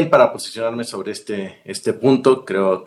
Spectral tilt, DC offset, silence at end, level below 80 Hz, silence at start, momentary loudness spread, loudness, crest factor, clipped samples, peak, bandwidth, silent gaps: -5.5 dB/octave; under 0.1%; 0 s; -64 dBFS; 0 s; 13 LU; -19 LUFS; 18 dB; under 0.1%; 0 dBFS; 12.5 kHz; none